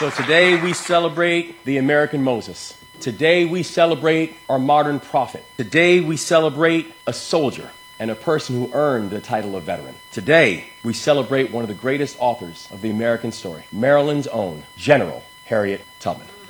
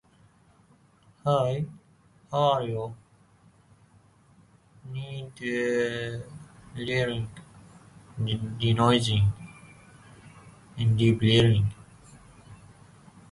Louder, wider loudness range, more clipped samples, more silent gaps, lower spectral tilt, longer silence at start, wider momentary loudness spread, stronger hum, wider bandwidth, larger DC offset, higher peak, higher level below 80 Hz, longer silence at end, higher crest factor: first, -19 LUFS vs -26 LUFS; second, 4 LU vs 8 LU; neither; neither; second, -5 dB/octave vs -6.5 dB/octave; second, 0 s vs 1.25 s; second, 14 LU vs 21 LU; neither; first, 19 kHz vs 11.5 kHz; neither; first, 0 dBFS vs -8 dBFS; second, -60 dBFS vs -52 dBFS; second, 0 s vs 0.75 s; about the same, 20 dB vs 20 dB